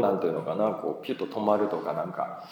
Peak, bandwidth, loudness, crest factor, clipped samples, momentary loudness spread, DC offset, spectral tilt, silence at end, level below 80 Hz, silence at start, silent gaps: -8 dBFS; 20 kHz; -29 LUFS; 20 dB; under 0.1%; 7 LU; under 0.1%; -8 dB/octave; 0 s; -82 dBFS; 0 s; none